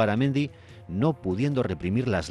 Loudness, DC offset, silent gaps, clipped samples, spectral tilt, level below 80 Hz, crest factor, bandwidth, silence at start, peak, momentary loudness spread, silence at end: -27 LUFS; under 0.1%; none; under 0.1%; -7.5 dB/octave; -54 dBFS; 14 dB; 11 kHz; 0 s; -10 dBFS; 5 LU; 0 s